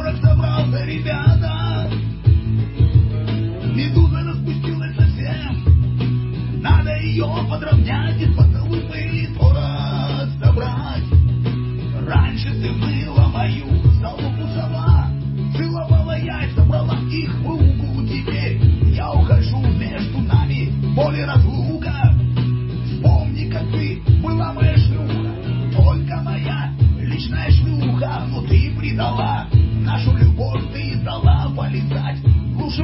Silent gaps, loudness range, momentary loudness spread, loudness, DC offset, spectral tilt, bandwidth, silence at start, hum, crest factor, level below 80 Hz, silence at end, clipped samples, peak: none; 1 LU; 7 LU; -18 LUFS; under 0.1%; -12 dB/octave; 5.8 kHz; 0 s; none; 16 dB; -22 dBFS; 0 s; under 0.1%; -2 dBFS